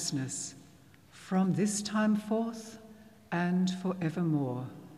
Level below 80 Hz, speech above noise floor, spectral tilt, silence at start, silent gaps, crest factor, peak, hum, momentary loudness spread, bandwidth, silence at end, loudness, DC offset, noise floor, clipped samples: -76 dBFS; 27 dB; -5.5 dB/octave; 0 s; none; 14 dB; -18 dBFS; none; 13 LU; 13.5 kHz; 0 s; -32 LUFS; under 0.1%; -58 dBFS; under 0.1%